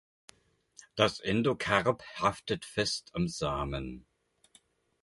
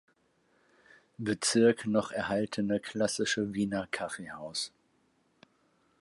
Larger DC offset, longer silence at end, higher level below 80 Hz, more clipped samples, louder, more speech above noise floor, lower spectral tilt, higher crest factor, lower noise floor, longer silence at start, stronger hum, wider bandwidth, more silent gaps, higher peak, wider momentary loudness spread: neither; second, 1.05 s vs 1.3 s; first, -52 dBFS vs -68 dBFS; neither; about the same, -31 LUFS vs -31 LUFS; second, 35 dB vs 41 dB; about the same, -4.5 dB/octave vs -4 dB/octave; about the same, 24 dB vs 20 dB; second, -66 dBFS vs -71 dBFS; second, 0.95 s vs 1.2 s; neither; about the same, 11.5 kHz vs 11.5 kHz; neither; first, -8 dBFS vs -14 dBFS; about the same, 11 LU vs 12 LU